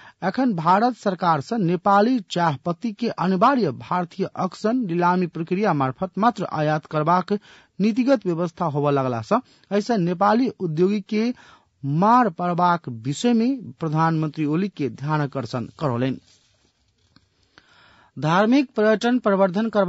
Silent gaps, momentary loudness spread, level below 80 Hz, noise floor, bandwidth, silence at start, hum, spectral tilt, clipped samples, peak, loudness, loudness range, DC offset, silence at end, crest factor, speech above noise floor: none; 9 LU; -66 dBFS; -64 dBFS; 8 kHz; 0.05 s; none; -7 dB/octave; under 0.1%; -6 dBFS; -22 LUFS; 4 LU; under 0.1%; 0 s; 16 dB; 43 dB